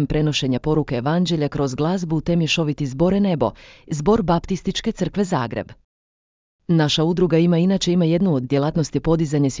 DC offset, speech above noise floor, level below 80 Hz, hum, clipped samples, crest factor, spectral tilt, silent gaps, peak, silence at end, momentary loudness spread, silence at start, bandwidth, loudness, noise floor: under 0.1%; over 71 dB; -42 dBFS; none; under 0.1%; 16 dB; -6.5 dB/octave; 5.84-6.59 s; -4 dBFS; 0 s; 6 LU; 0 s; 7.6 kHz; -20 LUFS; under -90 dBFS